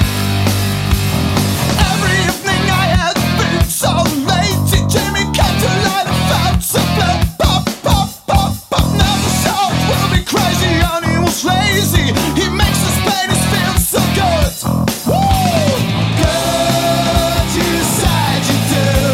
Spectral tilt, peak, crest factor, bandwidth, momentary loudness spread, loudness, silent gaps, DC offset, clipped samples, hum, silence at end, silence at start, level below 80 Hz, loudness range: -4.5 dB/octave; 0 dBFS; 12 dB; 16.5 kHz; 2 LU; -14 LUFS; none; under 0.1%; under 0.1%; none; 0 s; 0 s; -24 dBFS; 1 LU